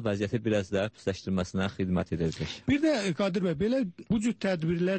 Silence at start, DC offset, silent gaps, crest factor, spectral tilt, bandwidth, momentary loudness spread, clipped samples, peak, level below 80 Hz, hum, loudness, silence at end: 0 s; under 0.1%; none; 14 dB; -6.5 dB/octave; 8.8 kHz; 5 LU; under 0.1%; -14 dBFS; -52 dBFS; none; -29 LUFS; 0 s